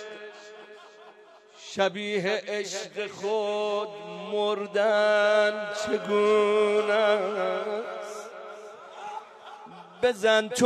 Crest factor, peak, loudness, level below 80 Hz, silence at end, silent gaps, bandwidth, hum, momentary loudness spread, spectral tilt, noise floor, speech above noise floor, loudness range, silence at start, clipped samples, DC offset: 18 dB; -10 dBFS; -26 LUFS; -76 dBFS; 0 s; none; 13 kHz; none; 22 LU; -3.5 dB/octave; -53 dBFS; 27 dB; 8 LU; 0 s; under 0.1%; under 0.1%